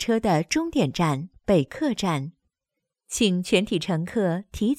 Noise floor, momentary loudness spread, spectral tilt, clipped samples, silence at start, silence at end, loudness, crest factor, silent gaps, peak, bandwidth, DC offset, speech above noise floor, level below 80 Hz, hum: -84 dBFS; 5 LU; -5 dB/octave; under 0.1%; 0 s; 0.05 s; -24 LUFS; 18 dB; none; -6 dBFS; 15.5 kHz; under 0.1%; 61 dB; -50 dBFS; none